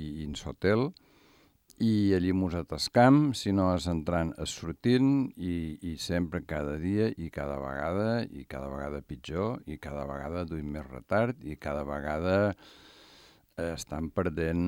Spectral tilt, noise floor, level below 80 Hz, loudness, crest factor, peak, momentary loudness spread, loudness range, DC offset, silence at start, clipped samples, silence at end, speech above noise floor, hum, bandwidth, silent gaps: -6.5 dB/octave; -63 dBFS; -52 dBFS; -30 LUFS; 20 dB; -10 dBFS; 13 LU; 8 LU; under 0.1%; 0 s; under 0.1%; 0 s; 33 dB; none; 16 kHz; none